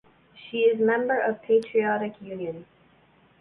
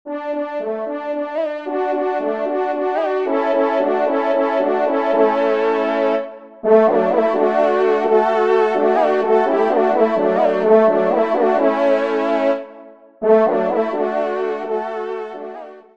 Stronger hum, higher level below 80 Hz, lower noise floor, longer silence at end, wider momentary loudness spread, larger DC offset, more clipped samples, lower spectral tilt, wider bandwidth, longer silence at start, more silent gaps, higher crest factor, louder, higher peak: neither; about the same, -70 dBFS vs -68 dBFS; first, -59 dBFS vs -41 dBFS; first, 0.8 s vs 0.15 s; first, 13 LU vs 10 LU; second, under 0.1% vs 0.3%; neither; about the same, -7 dB/octave vs -7 dB/octave; second, 5.4 kHz vs 7.4 kHz; first, 0.35 s vs 0.05 s; neither; about the same, 16 dB vs 16 dB; second, -25 LUFS vs -17 LUFS; second, -10 dBFS vs -2 dBFS